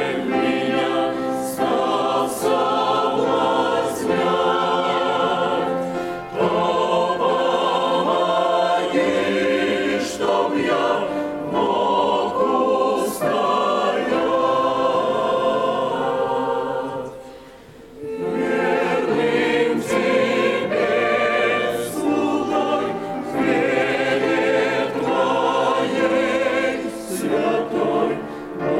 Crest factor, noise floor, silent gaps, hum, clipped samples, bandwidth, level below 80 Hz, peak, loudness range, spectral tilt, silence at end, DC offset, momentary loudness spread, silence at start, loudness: 14 dB; -42 dBFS; none; none; under 0.1%; 16 kHz; -56 dBFS; -6 dBFS; 2 LU; -4.5 dB/octave; 0 s; under 0.1%; 5 LU; 0 s; -20 LUFS